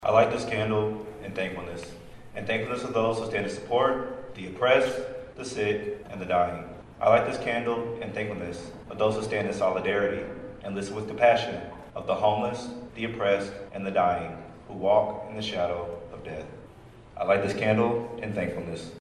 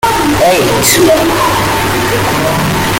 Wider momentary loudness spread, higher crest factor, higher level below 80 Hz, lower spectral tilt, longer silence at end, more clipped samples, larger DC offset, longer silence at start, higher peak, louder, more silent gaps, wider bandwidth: first, 16 LU vs 4 LU; first, 22 dB vs 10 dB; second, -54 dBFS vs -30 dBFS; first, -5.5 dB/octave vs -3.5 dB/octave; about the same, 0 s vs 0 s; neither; neither; about the same, 0 s vs 0 s; second, -6 dBFS vs 0 dBFS; second, -28 LUFS vs -9 LUFS; neither; second, 11.5 kHz vs 17 kHz